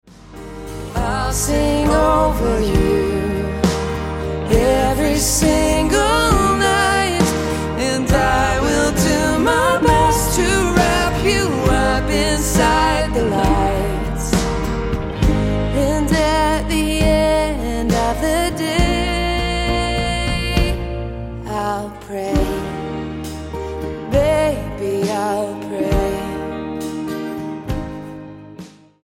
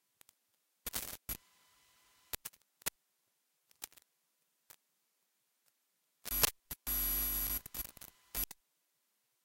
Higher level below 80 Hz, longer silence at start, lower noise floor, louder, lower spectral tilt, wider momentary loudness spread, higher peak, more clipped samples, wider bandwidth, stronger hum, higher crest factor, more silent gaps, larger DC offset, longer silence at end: first, -26 dBFS vs -56 dBFS; second, 0.2 s vs 0.85 s; second, -39 dBFS vs -81 dBFS; first, -18 LUFS vs -37 LUFS; first, -4.5 dB/octave vs -1 dB/octave; second, 12 LU vs 19 LU; first, 0 dBFS vs -10 dBFS; neither; about the same, 16.5 kHz vs 17 kHz; neither; second, 16 dB vs 34 dB; neither; neither; second, 0.35 s vs 0.9 s